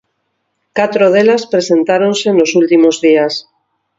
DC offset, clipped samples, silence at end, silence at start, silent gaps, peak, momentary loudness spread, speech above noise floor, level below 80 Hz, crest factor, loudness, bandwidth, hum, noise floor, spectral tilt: under 0.1%; under 0.1%; 0.55 s; 0.75 s; none; 0 dBFS; 7 LU; 57 dB; -62 dBFS; 12 dB; -11 LUFS; 7.8 kHz; none; -67 dBFS; -4.5 dB/octave